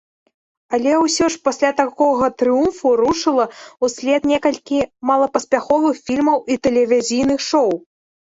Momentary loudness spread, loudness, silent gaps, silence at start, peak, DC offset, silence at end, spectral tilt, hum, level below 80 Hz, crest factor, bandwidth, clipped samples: 5 LU; -17 LUFS; none; 0.7 s; -2 dBFS; under 0.1%; 0.5 s; -3.5 dB/octave; none; -52 dBFS; 14 dB; 8.4 kHz; under 0.1%